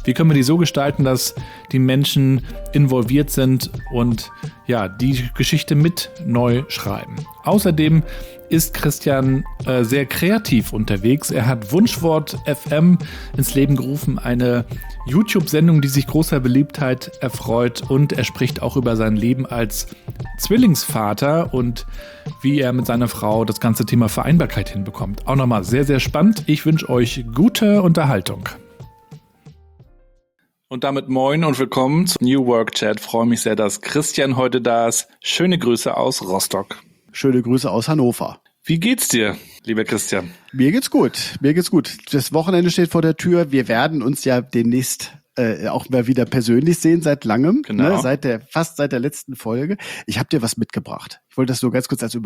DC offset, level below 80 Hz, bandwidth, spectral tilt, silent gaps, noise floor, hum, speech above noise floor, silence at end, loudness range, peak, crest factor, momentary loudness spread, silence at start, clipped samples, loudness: under 0.1%; -38 dBFS; over 20 kHz; -5.5 dB/octave; none; -68 dBFS; none; 51 dB; 0 s; 3 LU; -4 dBFS; 14 dB; 10 LU; 0 s; under 0.1%; -18 LUFS